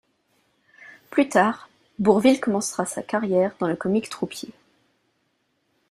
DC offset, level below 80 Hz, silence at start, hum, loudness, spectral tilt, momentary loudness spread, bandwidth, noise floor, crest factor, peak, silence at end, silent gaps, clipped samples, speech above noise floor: under 0.1%; -64 dBFS; 0.8 s; none; -22 LUFS; -5 dB/octave; 15 LU; 14.5 kHz; -71 dBFS; 22 dB; -4 dBFS; 1.4 s; none; under 0.1%; 49 dB